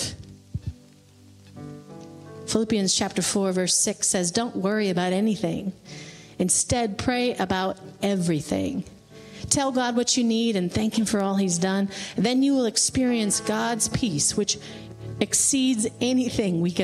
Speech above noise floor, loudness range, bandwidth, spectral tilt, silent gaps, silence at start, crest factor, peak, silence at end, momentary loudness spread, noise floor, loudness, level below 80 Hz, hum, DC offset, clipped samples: 28 dB; 3 LU; 15 kHz; -3.5 dB/octave; none; 0 s; 18 dB; -6 dBFS; 0 s; 19 LU; -52 dBFS; -23 LUFS; -52 dBFS; none; under 0.1%; under 0.1%